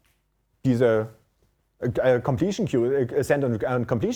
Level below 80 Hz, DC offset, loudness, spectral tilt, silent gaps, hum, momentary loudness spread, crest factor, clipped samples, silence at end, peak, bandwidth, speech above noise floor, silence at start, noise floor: -54 dBFS; under 0.1%; -24 LUFS; -7.5 dB/octave; none; none; 7 LU; 16 dB; under 0.1%; 0 s; -8 dBFS; 18 kHz; 47 dB; 0.65 s; -70 dBFS